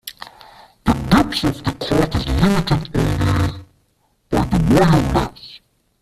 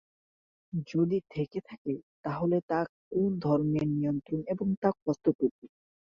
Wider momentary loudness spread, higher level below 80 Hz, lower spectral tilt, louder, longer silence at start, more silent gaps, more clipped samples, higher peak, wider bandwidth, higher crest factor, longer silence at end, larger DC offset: first, 20 LU vs 9 LU; first, -30 dBFS vs -64 dBFS; second, -6.5 dB/octave vs -9.5 dB/octave; first, -18 LUFS vs -31 LUFS; second, 0.05 s vs 0.75 s; second, none vs 1.78-1.85 s, 2.03-2.23 s, 2.63-2.69 s, 2.89-3.11 s, 4.77-4.82 s, 5.02-5.06 s, 5.35-5.39 s, 5.51-5.62 s; neither; first, -2 dBFS vs -12 dBFS; first, 14.5 kHz vs 7 kHz; about the same, 16 dB vs 18 dB; about the same, 0.45 s vs 0.45 s; neither